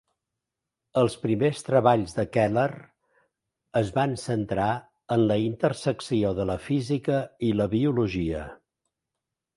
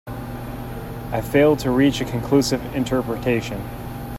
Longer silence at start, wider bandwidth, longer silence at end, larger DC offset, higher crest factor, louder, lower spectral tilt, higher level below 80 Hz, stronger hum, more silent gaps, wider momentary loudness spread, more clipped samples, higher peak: first, 0.95 s vs 0.05 s; second, 11.5 kHz vs 16.5 kHz; first, 1 s vs 0 s; neither; about the same, 20 dB vs 18 dB; second, -26 LUFS vs -21 LUFS; about the same, -7 dB/octave vs -6 dB/octave; second, -52 dBFS vs -38 dBFS; neither; neither; second, 7 LU vs 15 LU; neither; about the same, -6 dBFS vs -4 dBFS